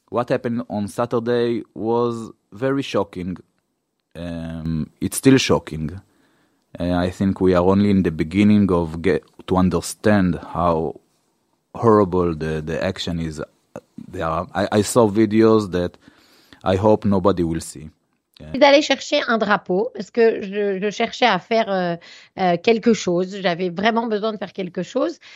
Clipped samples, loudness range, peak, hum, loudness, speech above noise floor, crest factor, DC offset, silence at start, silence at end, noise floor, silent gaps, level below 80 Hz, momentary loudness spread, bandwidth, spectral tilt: under 0.1%; 4 LU; 0 dBFS; none; -20 LUFS; 54 dB; 20 dB; under 0.1%; 0.1 s; 0 s; -73 dBFS; none; -46 dBFS; 14 LU; 15.5 kHz; -6 dB/octave